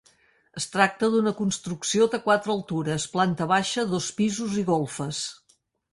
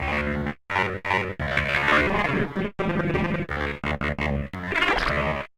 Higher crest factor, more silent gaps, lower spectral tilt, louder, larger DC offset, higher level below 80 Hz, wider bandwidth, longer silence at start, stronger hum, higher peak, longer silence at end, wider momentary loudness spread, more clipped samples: about the same, 20 dB vs 20 dB; neither; second, -4.5 dB/octave vs -6 dB/octave; about the same, -25 LUFS vs -24 LUFS; neither; second, -64 dBFS vs -38 dBFS; second, 11.5 kHz vs 15.5 kHz; first, 0.55 s vs 0 s; neither; about the same, -4 dBFS vs -6 dBFS; first, 0.6 s vs 0.1 s; about the same, 8 LU vs 8 LU; neither